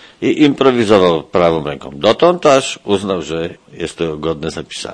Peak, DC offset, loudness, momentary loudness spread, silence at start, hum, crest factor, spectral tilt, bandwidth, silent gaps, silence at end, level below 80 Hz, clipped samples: 0 dBFS; under 0.1%; -14 LUFS; 13 LU; 0.2 s; none; 14 dB; -5 dB/octave; 10.5 kHz; none; 0 s; -46 dBFS; under 0.1%